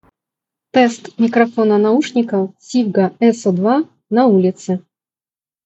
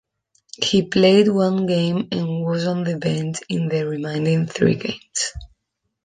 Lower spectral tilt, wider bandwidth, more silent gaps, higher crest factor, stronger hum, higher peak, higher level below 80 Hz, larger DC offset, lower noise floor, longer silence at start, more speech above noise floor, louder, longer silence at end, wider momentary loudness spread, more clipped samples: about the same, -6.5 dB/octave vs -5.5 dB/octave; second, 8.2 kHz vs 9.6 kHz; neither; about the same, 16 dB vs 18 dB; neither; about the same, 0 dBFS vs -2 dBFS; second, -68 dBFS vs -50 dBFS; neither; first, under -90 dBFS vs -76 dBFS; first, 0.75 s vs 0.6 s; first, over 76 dB vs 57 dB; first, -16 LUFS vs -20 LUFS; first, 0.85 s vs 0.6 s; second, 6 LU vs 10 LU; neither